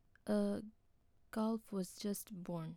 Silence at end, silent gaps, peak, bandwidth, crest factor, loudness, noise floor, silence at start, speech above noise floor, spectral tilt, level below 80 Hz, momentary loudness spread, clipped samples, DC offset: 0 s; none; -26 dBFS; 17.5 kHz; 16 dB; -41 LUFS; -71 dBFS; 0.25 s; 30 dB; -6 dB/octave; -70 dBFS; 9 LU; under 0.1%; under 0.1%